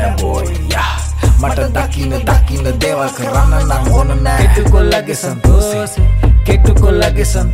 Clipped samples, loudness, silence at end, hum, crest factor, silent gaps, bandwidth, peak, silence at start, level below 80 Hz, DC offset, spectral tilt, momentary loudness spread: under 0.1%; -13 LUFS; 0 s; none; 10 dB; none; 15.5 kHz; 0 dBFS; 0 s; -12 dBFS; under 0.1%; -5.5 dB/octave; 6 LU